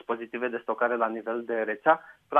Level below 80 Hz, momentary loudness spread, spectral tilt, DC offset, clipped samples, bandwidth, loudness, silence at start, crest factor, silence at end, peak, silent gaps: -80 dBFS; 7 LU; -7 dB/octave; under 0.1%; under 0.1%; 3.8 kHz; -28 LUFS; 0.1 s; 22 dB; 0 s; -6 dBFS; none